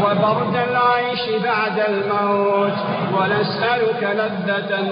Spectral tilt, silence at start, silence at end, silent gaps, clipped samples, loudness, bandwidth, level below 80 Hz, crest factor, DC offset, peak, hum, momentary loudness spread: -3.5 dB/octave; 0 s; 0 s; none; under 0.1%; -19 LUFS; 5.2 kHz; -62 dBFS; 14 dB; under 0.1%; -4 dBFS; none; 4 LU